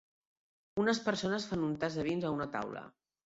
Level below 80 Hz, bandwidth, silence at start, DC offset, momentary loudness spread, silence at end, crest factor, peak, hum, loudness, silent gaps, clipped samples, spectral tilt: -66 dBFS; 7.6 kHz; 0.75 s; under 0.1%; 9 LU; 0.35 s; 20 dB; -16 dBFS; none; -35 LUFS; none; under 0.1%; -4.5 dB/octave